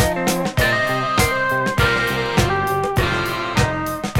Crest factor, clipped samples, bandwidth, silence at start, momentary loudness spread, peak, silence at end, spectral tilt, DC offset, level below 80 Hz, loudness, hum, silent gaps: 16 dB; under 0.1%; 17.5 kHz; 0 s; 3 LU; -2 dBFS; 0 s; -4.5 dB/octave; under 0.1%; -32 dBFS; -19 LUFS; none; none